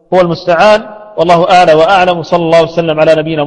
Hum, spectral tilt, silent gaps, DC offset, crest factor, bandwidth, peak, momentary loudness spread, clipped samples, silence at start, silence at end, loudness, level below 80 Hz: none; -5.5 dB/octave; none; under 0.1%; 8 dB; 9.8 kHz; 0 dBFS; 6 LU; 1%; 0.1 s; 0 s; -8 LUFS; -42 dBFS